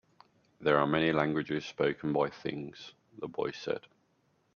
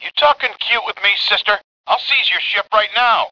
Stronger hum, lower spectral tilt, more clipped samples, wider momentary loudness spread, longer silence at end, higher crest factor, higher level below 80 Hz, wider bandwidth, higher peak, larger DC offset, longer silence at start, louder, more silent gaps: neither; first, -6.5 dB/octave vs -1 dB/octave; neither; first, 16 LU vs 5 LU; first, 0.75 s vs 0 s; first, 22 dB vs 16 dB; second, -68 dBFS vs -58 dBFS; first, 7 kHz vs 5.4 kHz; second, -12 dBFS vs 0 dBFS; neither; first, 0.6 s vs 0 s; second, -32 LUFS vs -15 LUFS; second, none vs 1.64-1.84 s